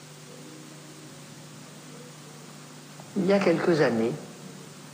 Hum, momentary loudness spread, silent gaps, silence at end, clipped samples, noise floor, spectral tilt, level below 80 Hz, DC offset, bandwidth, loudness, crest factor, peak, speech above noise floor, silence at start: none; 22 LU; none; 0 s; under 0.1%; -45 dBFS; -6 dB/octave; -74 dBFS; under 0.1%; 15.5 kHz; -25 LUFS; 20 dB; -10 dBFS; 22 dB; 0 s